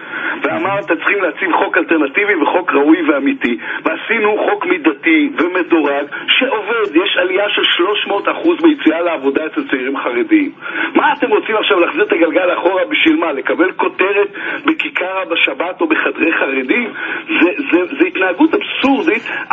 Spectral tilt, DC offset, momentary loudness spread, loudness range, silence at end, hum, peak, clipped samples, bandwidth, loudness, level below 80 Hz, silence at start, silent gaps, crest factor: -5.5 dB/octave; under 0.1%; 6 LU; 2 LU; 0 s; none; 0 dBFS; under 0.1%; 4.1 kHz; -14 LUFS; -62 dBFS; 0 s; none; 14 dB